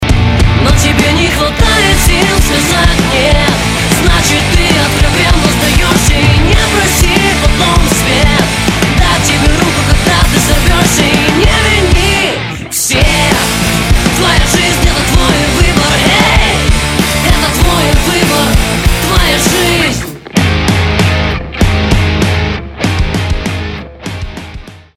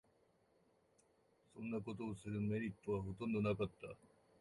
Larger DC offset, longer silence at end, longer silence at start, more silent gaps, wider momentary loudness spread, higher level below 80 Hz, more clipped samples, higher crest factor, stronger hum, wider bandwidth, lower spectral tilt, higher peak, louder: neither; second, 0.2 s vs 0.35 s; second, 0 s vs 1.55 s; neither; second, 6 LU vs 16 LU; first, -14 dBFS vs -68 dBFS; first, 0.5% vs under 0.1%; second, 8 dB vs 18 dB; neither; first, 16.5 kHz vs 11.5 kHz; second, -4 dB/octave vs -8 dB/octave; first, 0 dBFS vs -28 dBFS; first, -9 LUFS vs -43 LUFS